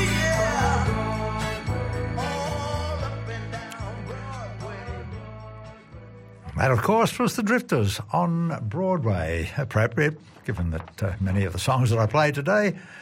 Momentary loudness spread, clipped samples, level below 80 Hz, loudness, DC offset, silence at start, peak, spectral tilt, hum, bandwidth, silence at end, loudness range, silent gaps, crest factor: 15 LU; under 0.1%; -40 dBFS; -25 LUFS; under 0.1%; 0 s; -10 dBFS; -6 dB/octave; none; 16 kHz; 0 s; 9 LU; none; 16 dB